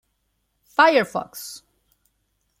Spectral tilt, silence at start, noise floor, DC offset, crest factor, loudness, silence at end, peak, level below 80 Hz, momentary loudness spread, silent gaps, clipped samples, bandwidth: -3.5 dB/octave; 0.8 s; -72 dBFS; under 0.1%; 22 dB; -19 LUFS; 1.05 s; -4 dBFS; -70 dBFS; 20 LU; none; under 0.1%; 16 kHz